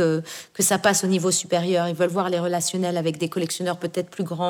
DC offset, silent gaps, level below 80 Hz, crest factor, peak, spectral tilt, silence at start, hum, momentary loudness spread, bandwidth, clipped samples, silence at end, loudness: under 0.1%; none; -70 dBFS; 18 dB; -4 dBFS; -4 dB/octave; 0 s; none; 9 LU; over 20 kHz; under 0.1%; 0 s; -23 LUFS